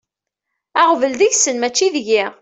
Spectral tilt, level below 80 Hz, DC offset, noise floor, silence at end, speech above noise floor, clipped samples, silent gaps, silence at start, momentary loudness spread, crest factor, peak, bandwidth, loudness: -0.5 dB/octave; -66 dBFS; under 0.1%; -80 dBFS; 0.1 s; 64 dB; under 0.1%; none; 0.75 s; 4 LU; 14 dB; -2 dBFS; 8.4 kHz; -15 LUFS